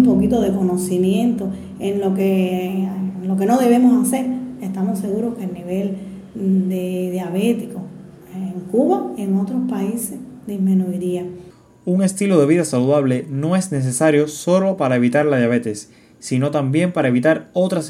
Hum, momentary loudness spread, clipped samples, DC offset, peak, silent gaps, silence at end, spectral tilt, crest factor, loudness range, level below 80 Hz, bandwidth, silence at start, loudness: none; 12 LU; under 0.1%; under 0.1%; -2 dBFS; none; 0 s; -6.5 dB/octave; 16 dB; 5 LU; -52 dBFS; 15.5 kHz; 0 s; -19 LUFS